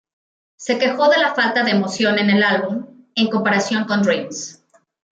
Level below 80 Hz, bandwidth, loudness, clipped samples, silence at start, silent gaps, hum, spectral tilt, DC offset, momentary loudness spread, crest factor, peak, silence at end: -68 dBFS; 8.8 kHz; -17 LUFS; under 0.1%; 0.6 s; none; none; -4.5 dB/octave; under 0.1%; 13 LU; 14 dB; -4 dBFS; 0.6 s